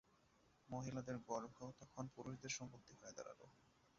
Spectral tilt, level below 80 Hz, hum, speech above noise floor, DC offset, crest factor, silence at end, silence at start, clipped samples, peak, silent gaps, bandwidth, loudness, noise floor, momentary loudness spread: -5 dB/octave; -78 dBFS; none; 24 dB; under 0.1%; 22 dB; 0.1 s; 0.1 s; under 0.1%; -32 dBFS; none; 7.4 kHz; -52 LUFS; -76 dBFS; 10 LU